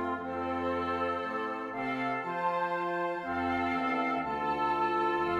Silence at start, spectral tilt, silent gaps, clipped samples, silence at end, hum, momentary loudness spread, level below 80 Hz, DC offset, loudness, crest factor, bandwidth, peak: 0 s; -6.5 dB/octave; none; under 0.1%; 0 s; none; 5 LU; -62 dBFS; under 0.1%; -32 LUFS; 12 dB; 12 kHz; -18 dBFS